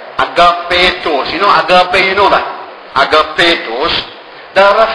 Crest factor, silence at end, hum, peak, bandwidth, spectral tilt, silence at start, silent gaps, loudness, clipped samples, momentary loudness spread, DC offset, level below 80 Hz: 10 dB; 0 s; none; 0 dBFS; 11 kHz; -3.5 dB/octave; 0 s; none; -10 LUFS; 1%; 8 LU; under 0.1%; -38 dBFS